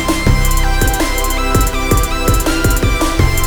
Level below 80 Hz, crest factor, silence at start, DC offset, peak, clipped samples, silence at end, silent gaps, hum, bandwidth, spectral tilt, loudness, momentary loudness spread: -16 dBFS; 12 dB; 0 s; under 0.1%; 0 dBFS; under 0.1%; 0 s; none; none; over 20 kHz; -4.5 dB/octave; -14 LUFS; 2 LU